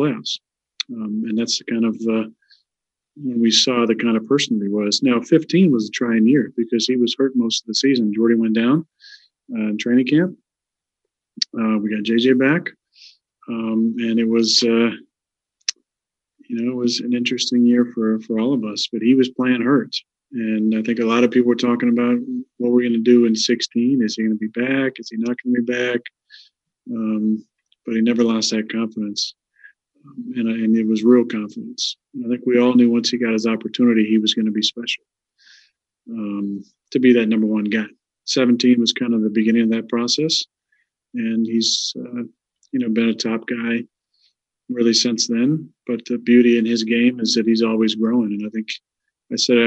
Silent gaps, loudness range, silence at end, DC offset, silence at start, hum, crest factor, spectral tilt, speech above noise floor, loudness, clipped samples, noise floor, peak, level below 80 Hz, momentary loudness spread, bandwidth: none; 5 LU; 0 s; under 0.1%; 0 s; none; 18 dB; -4.5 dB/octave; 68 dB; -19 LUFS; under 0.1%; -86 dBFS; -2 dBFS; -76 dBFS; 12 LU; 8.2 kHz